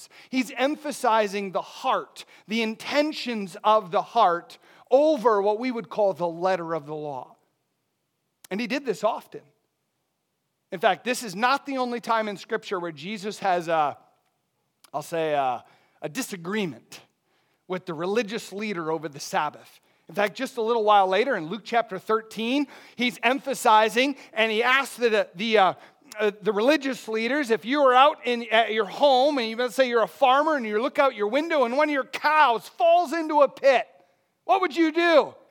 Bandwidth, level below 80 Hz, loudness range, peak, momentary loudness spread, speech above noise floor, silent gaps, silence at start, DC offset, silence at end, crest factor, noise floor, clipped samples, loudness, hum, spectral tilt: 19 kHz; under -90 dBFS; 9 LU; -4 dBFS; 12 LU; 53 dB; none; 0 s; under 0.1%; 0.2 s; 20 dB; -77 dBFS; under 0.1%; -24 LUFS; none; -4 dB/octave